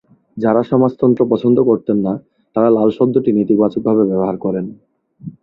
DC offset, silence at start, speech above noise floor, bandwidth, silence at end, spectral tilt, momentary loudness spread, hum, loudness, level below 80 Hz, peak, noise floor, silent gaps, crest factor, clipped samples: under 0.1%; 0.35 s; 21 dB; 5.2 kHz; 0.1 s; -11 dB/octave; 11 LU; none; -15 LUFS; -54 dBFS; 0 dBFS; -35 dBFS; none; 14 dB; under 0.1%